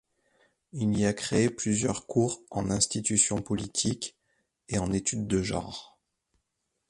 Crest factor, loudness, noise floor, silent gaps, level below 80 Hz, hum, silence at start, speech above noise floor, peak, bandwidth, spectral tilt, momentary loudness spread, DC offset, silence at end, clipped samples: 20 dB; -28 LUFS; -81 dBFS; none; -52 dBFS; none; 0.75 s; 52 dB; -10 dBFS; 11.5 kHz; -4 dB/octave; 10 LU; under 0.1%; 1.05 s; under 0.1%